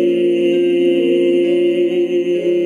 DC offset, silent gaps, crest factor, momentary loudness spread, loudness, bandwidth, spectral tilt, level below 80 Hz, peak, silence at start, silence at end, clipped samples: under 0.1%; none; 10 dB; 3 LU; -15 LUFS; 9.6 kHz; -7 dB/octave; -66 dBFS; -4 dBFS; 0 s; 0 s; under 0.1%